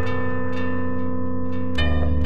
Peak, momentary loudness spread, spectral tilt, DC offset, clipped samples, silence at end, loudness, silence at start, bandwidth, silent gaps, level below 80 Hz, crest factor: -8 dBFS; 5 LU; -8 dB/octave; 10%; under 0.1%; 0 s; -26 LUFS; 0 s; 8.6 kHz; none; -32 dBFS; 14 dB